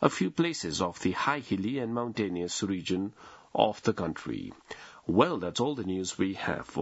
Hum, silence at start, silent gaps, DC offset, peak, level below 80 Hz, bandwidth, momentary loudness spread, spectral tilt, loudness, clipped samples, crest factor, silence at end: none; 0 s; none; under 0.1%; -6 dBFS; -64 dBFS; 8 kHz; 11 LU; -5 dB/octave; -31 LUFS; under 0.1%; 24 dB; 0 s